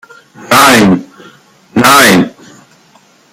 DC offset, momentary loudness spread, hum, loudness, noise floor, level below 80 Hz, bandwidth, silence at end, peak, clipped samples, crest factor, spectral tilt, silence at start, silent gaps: under 0.1%; 12 LU; none; -7 LUFS; -45 dBFS; -46 dBFS; over 20 kHz; 1.05 s; 0 dBFS; 0.5%; 10 dB; -3.5 dB/octave; 0.4 s; none